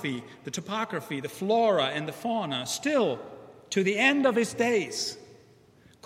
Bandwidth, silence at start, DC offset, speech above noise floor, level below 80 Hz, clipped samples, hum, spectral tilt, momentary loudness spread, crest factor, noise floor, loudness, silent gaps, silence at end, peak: 16 kHz; 0 s; under 0.1%; 30 dB; -72 dBFS; under 0.1%; none; -4 dB/octave; 14 LU; 20 dB; -58 dBFS; -27 LUFS; none; 0.75 s; -8 dBFS